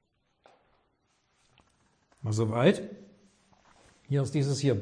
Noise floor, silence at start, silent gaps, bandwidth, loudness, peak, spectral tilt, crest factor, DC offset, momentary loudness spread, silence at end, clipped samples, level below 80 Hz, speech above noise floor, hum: -73 dBFS; 2.2 s; none; 10.5 kHz; -28 LUFS; -10 dBFS; -6.5 dB/octave; 22 dB; under 0.1%; 17 LU; 0 s; under 0.1%; -68 dBFS; 46 dB; none